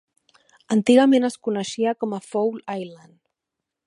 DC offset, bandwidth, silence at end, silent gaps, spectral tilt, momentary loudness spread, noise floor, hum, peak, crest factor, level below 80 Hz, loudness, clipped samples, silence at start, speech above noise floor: under 0.1%; 11.5 kHz; 0.9 s; none; -5.5 dB/octave; 16 LU; -84 dBFS; none; -4 dBFS; 20 dB; -74 dBFS; -21 LUFS; under 0.1%; 0.7 s; 64 dB